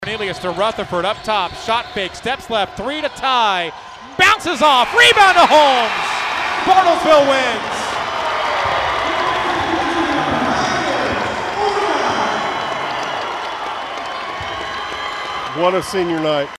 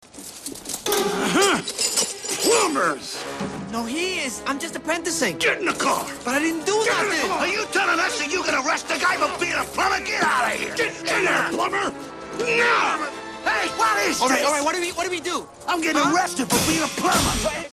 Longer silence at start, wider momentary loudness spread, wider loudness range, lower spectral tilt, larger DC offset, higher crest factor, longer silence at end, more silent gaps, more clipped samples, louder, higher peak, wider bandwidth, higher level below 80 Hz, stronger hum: second, 0 s vs 0.15 s; first, 12 LU vs 9 LU; first, 9 LU vs 2 LU; about the same, -3 dB/octave vs -2 dB/octave; neither; about the same, 14 dB vs 18 dB; about the same, 0 s vs 0.05 s; neither; neither; first, -16 LUFS vs -21 LUFS; first, -2 dBFS vs -6 dBFS; first, 15.5 kHz vs 14 kHz; about the same, -46 dBFS vs -48 dBFS; neither